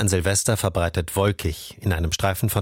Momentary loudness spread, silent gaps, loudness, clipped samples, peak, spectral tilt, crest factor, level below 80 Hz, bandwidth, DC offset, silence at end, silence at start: 8 LU; none; -23 LUFS; under 0.1%; -6 dBFS; -4.5 dB/octave; 16 dB; -36 dBFS; 17 kHz; under 0.1%; 0 s; 0 s